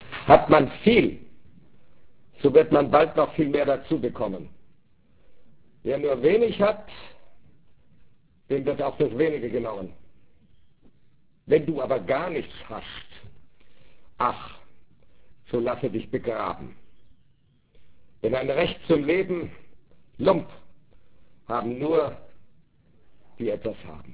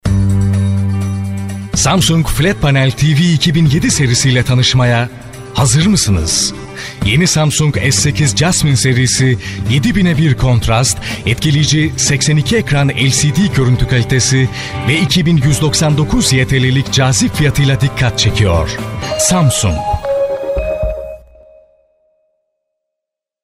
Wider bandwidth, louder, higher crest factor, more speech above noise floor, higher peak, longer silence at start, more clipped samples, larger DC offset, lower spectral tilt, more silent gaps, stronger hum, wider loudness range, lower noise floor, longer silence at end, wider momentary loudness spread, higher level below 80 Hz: second, 4 kHz vs 15.5 kHz; second, -24 LUFS vs -12 LUFS; first, 26 dB vs 12 dB; second, 39 dB vs 70 dB; about the same, 0 dBFS vs 0 dBFS; about the same, 0 s vs 0.05 s; neither; first, 0.6% vs under 0.1%; first, -10 dB/octave vs -4.5 dB/octave; neither; neither; first, 9 LU vs 3 LU; second, -62 dBFS vs -81 dBFS; second, 0 s vs 2.25 s; first, 19 LU vs 7 LU; second, -52 dBFS vs -28 dBFS